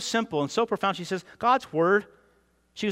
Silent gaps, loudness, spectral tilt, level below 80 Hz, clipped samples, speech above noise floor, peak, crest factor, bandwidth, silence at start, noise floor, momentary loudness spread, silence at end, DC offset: none; -26 LUFS; -4.5 dB/octave; -68 dBFS; under 0.1%; 39 dB; -10 dBFS; 18 dB; 16 kHz; 0 s; -65 dBFS; 9 LU; 0 s; under 0.1%